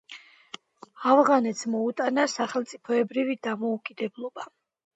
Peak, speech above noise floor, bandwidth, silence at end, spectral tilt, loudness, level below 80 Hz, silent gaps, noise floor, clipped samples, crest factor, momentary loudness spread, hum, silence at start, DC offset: -6 dBFS; 24 dB; 8.4 kHz; 0.5 s; -4 dB/octave; -26 LUFS; -82 dBFS; none; -49 dBFS; under 0.1%; 22 dB; 23 LU; none; 0.1 s; under 0.1%